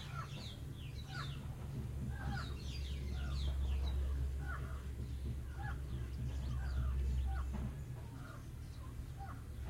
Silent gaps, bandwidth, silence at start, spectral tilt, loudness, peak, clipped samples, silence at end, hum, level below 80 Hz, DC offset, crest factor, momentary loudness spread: none; 15 kHz; 0 s; -6 dB/octave; -44 LUFS; -28 dBFS; under 0.1%; 0 s; none; -42 dBFS; under 0.1%; 14 dB; 9 LU